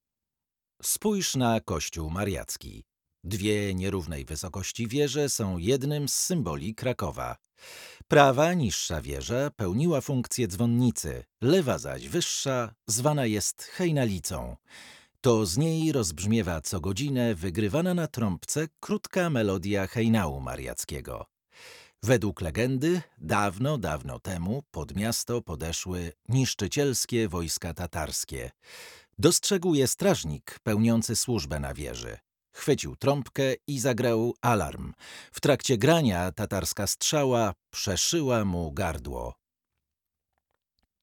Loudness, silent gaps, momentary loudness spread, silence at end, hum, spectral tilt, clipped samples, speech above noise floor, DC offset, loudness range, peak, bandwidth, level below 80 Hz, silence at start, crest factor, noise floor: -28 LUFS; none; 12 LU; 1.7 s; none; -4.5 dB/octave; under 0.1%; 62 dB; under 0.1%; 4 LU; -4 dBFS; 19 kHz; -50 dBFS; 0.85 s; 24 dB; -90 dBFS